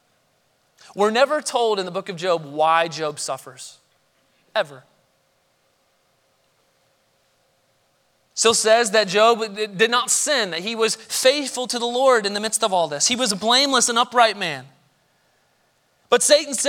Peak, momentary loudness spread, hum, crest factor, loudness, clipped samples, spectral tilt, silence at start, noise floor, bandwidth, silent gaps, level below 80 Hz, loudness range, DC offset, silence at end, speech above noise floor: -2 dBFS; 12 LU; none; 20 dB; -19 LUFS; under 0.1%; -1.5 dB/octave; 0.95 s; -65 dBFS; 18 kHz; none; -74 dBFS; 16 LU; under 0.1%; 0 s; 45 dB